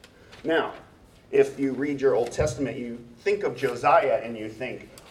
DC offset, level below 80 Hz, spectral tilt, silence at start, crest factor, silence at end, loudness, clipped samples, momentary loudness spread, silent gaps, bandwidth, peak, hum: under 0.1%; -50 dBFS; -5.5 dB/octave; 0.3 s; 20 dB; 0 s; -26 LUFS; under 0.1%; 14 LU; none; 13 kHz; -6 dBFS; none